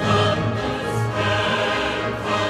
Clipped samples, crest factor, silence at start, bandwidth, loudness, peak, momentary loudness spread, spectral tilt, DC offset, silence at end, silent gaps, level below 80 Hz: under 0.1%; 14 dB; 0 s; 13 kHz; -21 LUFS; -6 dBFS; 5 LU; -5 dB/octave; under 0.1%; 0 s; none; -42 dBFS